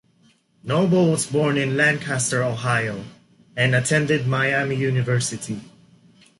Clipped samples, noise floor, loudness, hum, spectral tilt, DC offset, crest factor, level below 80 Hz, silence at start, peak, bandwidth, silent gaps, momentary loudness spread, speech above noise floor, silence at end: under 0.1%; -59 dBFS; -21 LUFS; none; -5 dB/octave; under 0.1%; 16 dB; -58 dBFS; 0.65 s; -6 dBFS; 11.5 kHz; none; 13 LU; 39 dB; 0.75 s